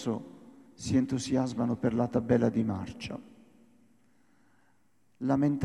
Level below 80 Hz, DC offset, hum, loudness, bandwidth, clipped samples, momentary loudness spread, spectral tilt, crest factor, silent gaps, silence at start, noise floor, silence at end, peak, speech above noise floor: -60 dBFS; under 0.1%; none; -30 LUFS; 11 kHz; under 0.1%; 14 LU; -7 dB/octave; 18 dB; none; 0 s; -71 dBFS; 0 s; -12 dBFS; 43 dB